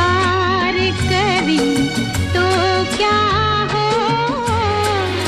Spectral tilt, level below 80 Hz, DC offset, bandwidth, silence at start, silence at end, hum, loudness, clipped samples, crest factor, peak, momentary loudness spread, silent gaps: -5 dB/octave; -32 dBFS; under 0.1%; 14.5 kHz; 0 s; 0 s; none; -16 LUFS; under 0.1%; 12 dB; -4 dBFS; 3 LU; none